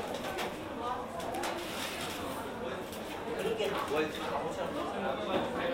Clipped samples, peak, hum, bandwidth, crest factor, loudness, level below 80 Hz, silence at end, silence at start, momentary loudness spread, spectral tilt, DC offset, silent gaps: under 0.1%; -18 dBFS; none; 16 kHz; 18 dB; -36 LUFS; -60 dBFS; 0 s; 0 s; 6 LU; -4 dB/octave; under 0.1%; none